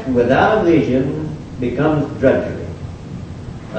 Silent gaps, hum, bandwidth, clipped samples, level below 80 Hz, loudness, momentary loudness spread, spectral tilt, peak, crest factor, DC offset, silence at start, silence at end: none; none; 8.6 kHz; under 0.1%; -38 dBFS; -16 LUFS; 18 LU; -8 dB/octave; 0 dBFS; 16 dB; under 0.1%; 0 s; 0 s